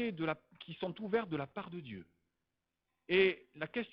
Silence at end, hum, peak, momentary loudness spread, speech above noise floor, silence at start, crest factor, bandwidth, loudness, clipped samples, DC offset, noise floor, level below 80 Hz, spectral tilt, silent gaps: 0.05 s; none; -16 dBFS; 18 LU; 51 dB; 0 s; 22 dB; 5.4 kHz; -36 LUFS; under 0.1%; under 0.1%; -88 dBFS; -72 dBFS; -8.5 dB/octave; none